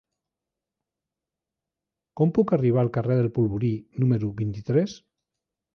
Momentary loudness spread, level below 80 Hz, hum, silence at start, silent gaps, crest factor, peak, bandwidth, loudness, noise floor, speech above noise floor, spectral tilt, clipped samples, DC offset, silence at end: 7 LU; -56 dBFS; none; 2.15 s; none; 18 dB; -8 dBFS; 6.6 kHz; -24 LUFS; -88 dBFS; 65 dB; -9.5 dB/octave; under 0.1%; under 0.1%; 0.8 s